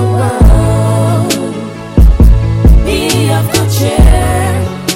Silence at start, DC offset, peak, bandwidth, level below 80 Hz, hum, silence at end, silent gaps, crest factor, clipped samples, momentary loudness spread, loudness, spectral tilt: 0 s; under 0.1%; 0 dBFS; 16.5 kHz; -10 dBFS; none; 0 s; none; 8 dB; 3%; 7 LU; -10 LUFS; -6 dB/octave